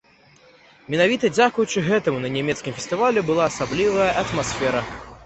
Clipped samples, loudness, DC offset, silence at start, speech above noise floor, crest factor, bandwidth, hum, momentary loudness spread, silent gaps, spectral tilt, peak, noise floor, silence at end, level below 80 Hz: under 0.1%; -21 LUFS; under 0.1%; 0.9 s; 32 dB; 18 dB; 8.4 kHz; none; 8 LU; none; -4.5 dB/octave; -4 dBFS; -53 dBFS; 0 s; -50 dBFS